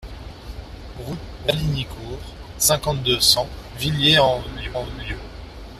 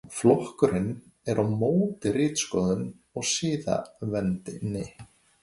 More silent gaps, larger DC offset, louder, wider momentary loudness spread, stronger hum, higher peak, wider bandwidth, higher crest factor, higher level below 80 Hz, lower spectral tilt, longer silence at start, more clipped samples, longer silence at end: neither; neither; first, -19 LUFS vs -27 LUFS; first, 23 LU vs 10 LU; neither; first, -2 dBFS vs -6 dBFS; first, 15.5 kHz vs 11.5 kHz; about the same, 22 dB vs 20 dB; first, -38 dBFS vs -56 dBFS; second, -3 dB/octave vs -5.5 dB/octave; about the same, 0 s vs 0.05 s; neither; second, 0 s vs 0.35 s